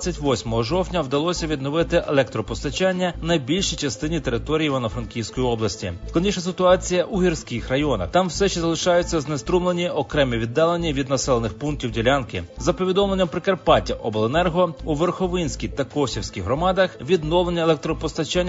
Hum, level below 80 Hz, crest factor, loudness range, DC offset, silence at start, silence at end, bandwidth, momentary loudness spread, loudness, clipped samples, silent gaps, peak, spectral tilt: none; -36 dBFS; 18 dB; 2 LU; under 0.1%; 0 s; 0 s; 7.8 kHz; 6 LU; -22 LUFS; under 0.1%; none; -2 dBFS; -5 dB/octave